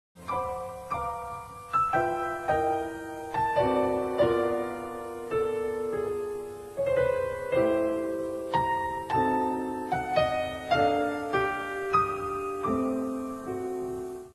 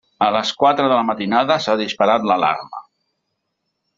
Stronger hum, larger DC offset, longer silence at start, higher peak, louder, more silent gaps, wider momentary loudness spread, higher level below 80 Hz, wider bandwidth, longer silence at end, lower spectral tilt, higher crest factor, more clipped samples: neither; neither; about the same, 0.15 s vs 0.2 s; second, -12 dBFS vs -2 dBFS; second, -29 LUFS vs -17 LUFS; neither; first, 10 LU vs 6 LU; first, -54 dBFS vs -62 dBFS; first, 13 kHz vs 7.8 kHz; second, 0.05 s vs 1.15 s; first, -6 dB/octave vs -4.5 dB/octave; about the same, 16 dB vs 16 dB; neither